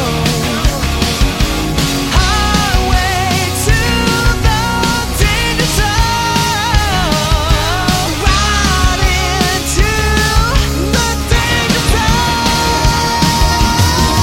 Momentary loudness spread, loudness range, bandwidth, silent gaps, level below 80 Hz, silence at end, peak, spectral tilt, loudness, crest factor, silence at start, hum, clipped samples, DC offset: 3 LU; 1 LU; 17 kHz; none; -18 dBFS; 0 s; 0 dBFS; -4 dB/octave; -12 LUFS; 12 dB; 0 s; none; under 0.1%; under 0.1%